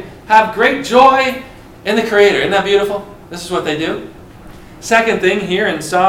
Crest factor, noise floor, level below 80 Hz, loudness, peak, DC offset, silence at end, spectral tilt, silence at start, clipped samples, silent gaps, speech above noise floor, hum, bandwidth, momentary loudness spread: 14 dB; -35 dBFS; -44 dBFS; -13 LUFS; 0 dBFS; under 0.1%; 0 s; -4 dB/octave; 0 s; 0.1%; none; 23 dB; none; 16.5 kHz; 15 LU